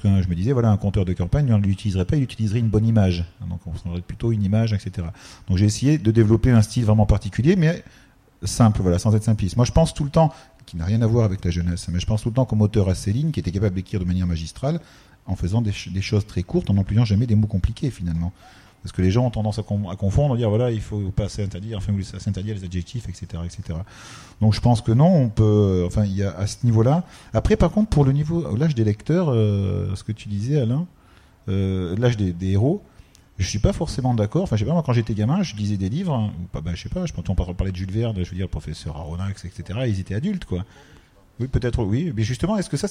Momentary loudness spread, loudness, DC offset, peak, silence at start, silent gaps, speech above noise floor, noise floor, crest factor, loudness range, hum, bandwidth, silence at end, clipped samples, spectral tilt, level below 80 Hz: 12 LU; -22 LUFS; under 0.1%; -4 dBFS; 0 s; none; 31 dB; -52 dBFS; 18 dB; 7 LU; none; 11.5 kHz; 0 s; under 0.1%; -7.5 dB/octave; -36 dBFS